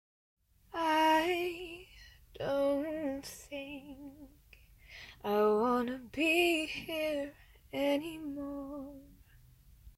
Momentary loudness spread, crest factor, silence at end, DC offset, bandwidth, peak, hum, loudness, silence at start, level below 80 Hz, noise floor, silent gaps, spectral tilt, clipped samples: 21 LU; 18 dB; 0.05 s; under 0.1%; 16 kHz; -18 dBFS; none; -33 LUFS; 0.75 s; -62 dBFS; -61 dBFS; none; -4 dB/octave; under 0.1%